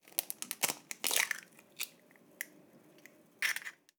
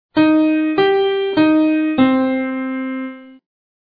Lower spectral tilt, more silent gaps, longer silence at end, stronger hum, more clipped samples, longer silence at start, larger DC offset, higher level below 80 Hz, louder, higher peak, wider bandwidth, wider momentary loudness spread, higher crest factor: second, 1 dB/octave vs -8.5 dB/octave; neither; second, 0.3 s vs 0.55 s; neither; neither; about the same, 0.05 s vs 0.15 s; neither; second, under -90 dBFS vs -58 dBFS; second, -36 LUFS vs -16 LUFS; second, -6 dBFS vs -2 dBFS; first, over 20 kHz vs 5 kHz; first, 15 LU vs 10 LU; first, 36 dB vs 14 dB